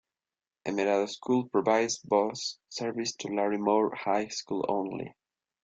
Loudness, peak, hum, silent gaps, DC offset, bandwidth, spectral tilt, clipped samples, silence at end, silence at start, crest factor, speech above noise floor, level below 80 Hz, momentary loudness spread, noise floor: -29 LUFS; -10 dBFS; none; none; under 0.1%; 9.2 kHz; -4 dB/octave; under 0.1%; 0.55 s; 0.65 s; 20 dB; over 61 dB; -72 dBFS; 9 LU; under -90 dBFS